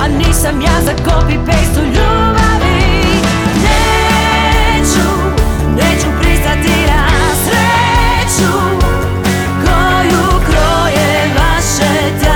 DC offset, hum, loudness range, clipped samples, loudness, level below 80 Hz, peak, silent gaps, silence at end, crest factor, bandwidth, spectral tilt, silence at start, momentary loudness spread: under 0.1%; none; 1 LU; under 0.1%; -11 LUFS; -16 dBFS; 0 dBFS; none; 0 s; 10 dB; 19.5 kHz; -4.5 dB/octave; 0 s; 3 LU